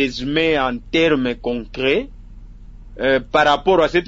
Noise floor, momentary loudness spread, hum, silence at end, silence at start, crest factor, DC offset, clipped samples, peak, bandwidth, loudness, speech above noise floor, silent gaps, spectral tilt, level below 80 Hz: -37 dBFS; 8 LU; none; 0 s; 0 s; 16 dB; under 0.1%; under 0.1%; -2 dBFS; 7.8 kHz; -18 LUFS; 20 dB; none; -5.5 dB/octave; -38 dBFS